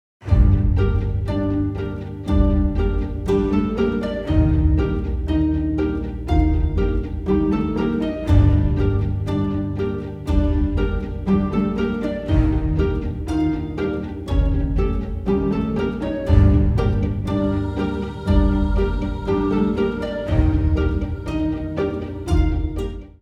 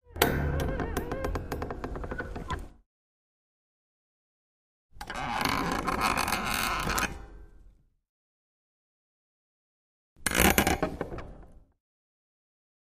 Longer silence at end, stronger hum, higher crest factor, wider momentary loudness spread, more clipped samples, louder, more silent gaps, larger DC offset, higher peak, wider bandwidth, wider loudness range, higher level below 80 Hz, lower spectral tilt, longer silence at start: second, 0.15 s vs 1.3 s; neither; second, 18 dB vs 30 dB; second, 7 LU vs 15 LU; neither; first, -21 LUFS vs -30 LUFS; second, none vs 2.86-4.89 s, 8.09-10.16 s; neither; about the same, -2 dBFS vs -2 dBFS; second, 7 kHz vs 15.5 kHz; second, 2 LU vs 11 LU; first, -24 dBFS vs -42 dBFS; first, -9 dB/octave vs -3.5 dB/octave; about the same, 0.2 s vs 0.1 s